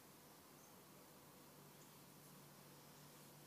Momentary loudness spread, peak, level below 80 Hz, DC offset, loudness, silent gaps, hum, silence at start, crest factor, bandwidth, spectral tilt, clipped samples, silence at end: 1 LU; -50 dBFS; under -90 dBFS; under 0.1%; -62 LUFS; none; none; 0 s; 14 dB; 15.5 kHz; -3.5 dB/octave; under 0.1%; 0 s